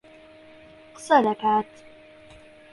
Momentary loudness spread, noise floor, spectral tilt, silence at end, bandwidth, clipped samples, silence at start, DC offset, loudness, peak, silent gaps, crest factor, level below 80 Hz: 20 LU; -49 dBFS; -5 dB/octave; 1.1 s; 11.5 kHz; under 0.1%; 1 s; under 0.1%; -22 LUFS; -6 dBFS; none; 20 dB; -66 dBFS